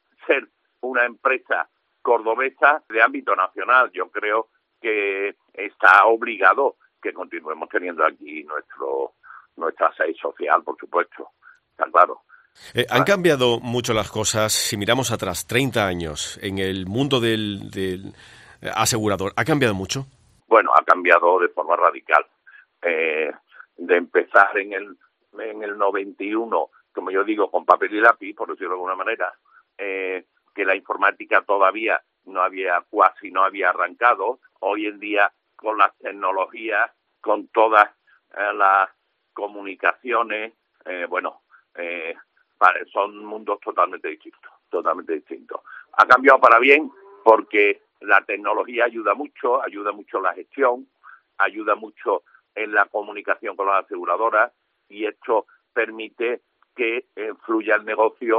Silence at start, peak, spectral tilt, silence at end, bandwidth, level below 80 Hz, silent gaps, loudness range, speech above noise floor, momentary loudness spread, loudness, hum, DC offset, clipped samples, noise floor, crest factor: 0.25 s; 0 dBFS; -4 dB/octave; 0 s; 14 kHz; -62 dBFS; none; 7 LU; 26 dB; 15 LU; -20 LUFS; none; under 0.1%; under 0.1%; -47 dBFS; 22 dB